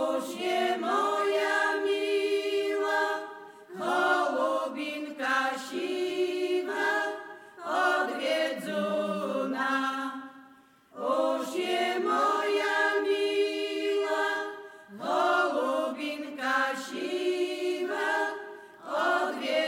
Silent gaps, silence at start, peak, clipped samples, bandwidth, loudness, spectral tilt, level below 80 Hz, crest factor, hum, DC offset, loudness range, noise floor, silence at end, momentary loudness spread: none; 0 s; -14 dBFS; under 0.1%; 16.5 kHz; -29 LUFS; -3 dB/octave; -88 dBFS; 16 dB; none; under 0.1%; 3 LU; -57 dBFS; 0 s; 9 LU